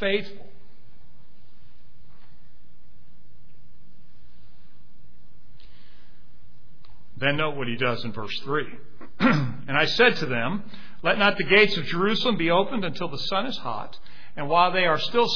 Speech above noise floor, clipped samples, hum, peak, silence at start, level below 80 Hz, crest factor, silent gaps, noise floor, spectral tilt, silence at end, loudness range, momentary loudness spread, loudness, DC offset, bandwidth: 33 dB; under 0.1%; none; -4 dBFS; 0 s; -54 dBFS; 22 dB; none; -57 dBFS; -5.5 dB/octave; 0 s; 9 LU; 15 LU; -23 LUFS; 4%; 5.4 kHz